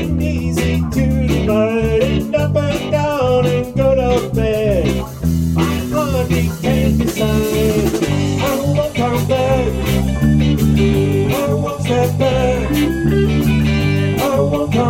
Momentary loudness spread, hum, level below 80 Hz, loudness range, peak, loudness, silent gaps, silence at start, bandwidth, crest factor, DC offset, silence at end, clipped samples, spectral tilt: 3 LU; none; -26 dBFS; 1 LU; -2 dBFS; -16 LUFS; none; 0 s; 16.5 kHz; 12 dB; under 0.1%; 0 s; under 0.1%; -6.5 dB/octave